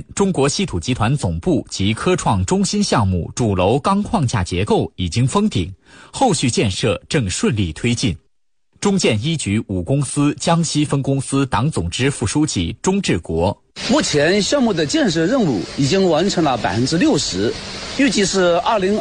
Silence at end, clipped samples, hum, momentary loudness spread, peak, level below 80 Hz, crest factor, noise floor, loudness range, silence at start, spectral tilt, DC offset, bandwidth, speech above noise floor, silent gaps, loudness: 0 s; under 0.1%; none; 5 LU; -4 dBFS; -40 dBFS; 14 dB; -69 dBFS; 3 LU; 0 s; -5 dB/octave; under 0.1%; 10 kHz; 52 dB; none; -18 LUFS